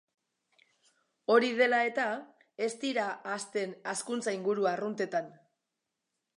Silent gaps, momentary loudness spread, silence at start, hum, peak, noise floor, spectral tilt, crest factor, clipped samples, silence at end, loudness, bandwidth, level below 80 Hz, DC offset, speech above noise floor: none; 11 LU; 1.3 s; none; -12 dBFS; -86 dBFS; -3.5 dB/octave; 22 dB; under 0.1%; 1.05 s; -31 LUFS; 11.5 kHz; -90 dBFS; under 0.1%; 55 dB